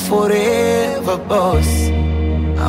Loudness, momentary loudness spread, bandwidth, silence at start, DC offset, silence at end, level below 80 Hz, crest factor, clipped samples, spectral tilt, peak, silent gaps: -16 LUFS; 4 LU; 16.5 kHz; 0 s; under 0.1%; 0 s; -22 dBFS; 12 dB; under 0.1%; -6 dB/octave; -4 dBFS; none